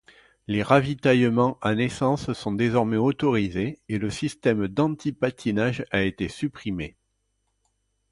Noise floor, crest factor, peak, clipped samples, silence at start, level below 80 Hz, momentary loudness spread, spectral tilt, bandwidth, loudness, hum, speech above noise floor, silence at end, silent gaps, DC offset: -74 dBFS; 20 dB; -4 dBFS; under 0.1%; 0.5 s; -52 dBFS; 9 LU; -6.5 dB/octave; 11.5 kHz; -24 LUFS; 50 Hz at -50 dBFS; 50 dB; 1.2 s; none; under 0.1%